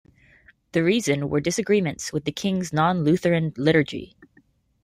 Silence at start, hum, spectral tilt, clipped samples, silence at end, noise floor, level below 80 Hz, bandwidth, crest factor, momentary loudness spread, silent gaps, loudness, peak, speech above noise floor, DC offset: 0.75 s; none; -5.5 dB/octave; under 0.1%; 0.8 s; -61 dBFS; -56 dBFS; 15.5 kHz; 18 dB; 7 LU; none; -23 LUFS; -6 dBFS; 39 dB; under 0.1%